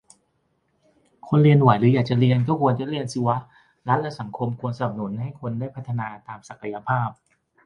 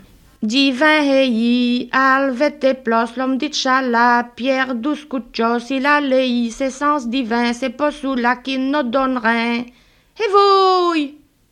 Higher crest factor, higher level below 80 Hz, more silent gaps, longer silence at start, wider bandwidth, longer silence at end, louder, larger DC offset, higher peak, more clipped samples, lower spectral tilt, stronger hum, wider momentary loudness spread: first, 22 dB vs 16 dB; second, -60 dBFS vs -54 dBFS; neither; first, 1.25 s vs 0.4 s; about the same, 10.5 kHz vs 11 kHz; first, 0.5 s vs 0.35 s; second, -22 LUFS vs -17 LUFS; neither; about the same, -2 dBFS vs -2 dBFS; neither; first, -8 dB/octave vs -3.5 dB/octave; neither; first, 16 LU vs 8 LU